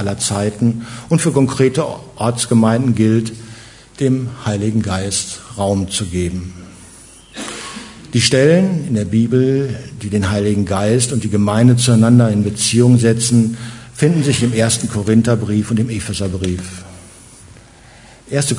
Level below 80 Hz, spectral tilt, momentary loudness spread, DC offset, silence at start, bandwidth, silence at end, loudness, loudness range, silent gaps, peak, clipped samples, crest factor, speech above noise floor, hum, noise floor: -48 dBFS; -5.5 dB/octave; 15 LU; under 0.1%; 0 s; 11 kHz; 0 s; -15 LUFS; 7 LU; none; 0 dBFS; under 0.1%; 16 dB; 27 dB; none; -42 dBFS